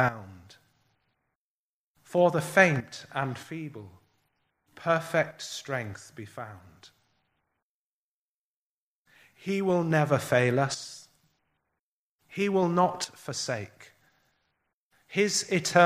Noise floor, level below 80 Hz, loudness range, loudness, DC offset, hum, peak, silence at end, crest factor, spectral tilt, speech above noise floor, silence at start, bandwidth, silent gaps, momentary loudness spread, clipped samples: under -90 dBFS; -70 dBFS; 10 LU; -27 LUFS; under 0.1%; none; -4 dBFS; 0 s; 26 dB; -4.5 dB/octave; over 63 dB; 0 s; 15.5 kHz; 1.35-1.95 s, 7.62-9.05 s, 11.80-12.19 s, 14.73-14.91 s; 19 LU; under 0.1%